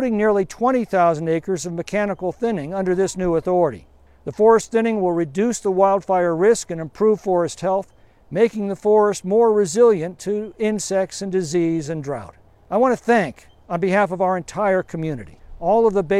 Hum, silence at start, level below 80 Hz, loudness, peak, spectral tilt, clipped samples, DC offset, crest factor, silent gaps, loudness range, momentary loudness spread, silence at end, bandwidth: none; 0 s; -50 dBFS; -20 LUFS; -2 dBFS; -6 dB/octave; under 0.1%; under 0.1%; 16 dB; none; 3 LU; 10 LU; 0 s; 13 kHz